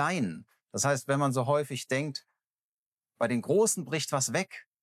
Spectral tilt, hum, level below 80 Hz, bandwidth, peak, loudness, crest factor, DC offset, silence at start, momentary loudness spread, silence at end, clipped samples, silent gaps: -4 dB/octave; none; -82 dBFS; 15.5 kHz; -14 dBFS; -29 LUFS; 18 dB; under 0.1%; 0 s; 12 LU; 0.25 s; under 0.1%; 2.59-2.98 s